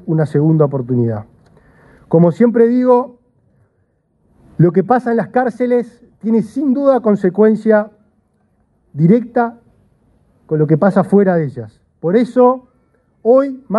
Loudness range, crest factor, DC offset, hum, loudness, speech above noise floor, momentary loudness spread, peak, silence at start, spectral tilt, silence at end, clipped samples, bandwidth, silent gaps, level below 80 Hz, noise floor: 3 LU; 14 dB; under 0.1%; none; -14 LUFS; 48 dB; 12 LU; 0 dBFS; 0.05 s; -10 dB/octave; 0 s; under 0.1%; 9.6 kHz; none; -58 dBFS; -61 dBFS